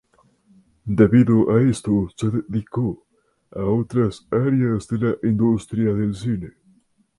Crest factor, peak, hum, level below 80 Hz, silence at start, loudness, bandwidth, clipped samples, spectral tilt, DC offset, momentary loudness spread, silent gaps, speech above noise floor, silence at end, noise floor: 18 dB; -2 dBFS; none; -48 dBFS; 0.85 s; -20 LUFS; 11.5 kHz; under 0.1%; -8.5 dB/octave; under 0.1%; 12 LU; none; 40 dB; 0.7 s; -59 dBFS